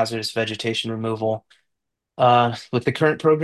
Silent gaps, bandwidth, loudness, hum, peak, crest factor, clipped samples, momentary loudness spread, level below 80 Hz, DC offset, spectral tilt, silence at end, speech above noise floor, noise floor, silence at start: none; 12.5 kHz; -21 LUFS; none; -6 dBFS; 16 dB; under 0.1%; 9 LU; -62 dBFS; under 0.1%; -5.5 dB/octave; 0 s; 59 dB; -80 dBFS; 0 s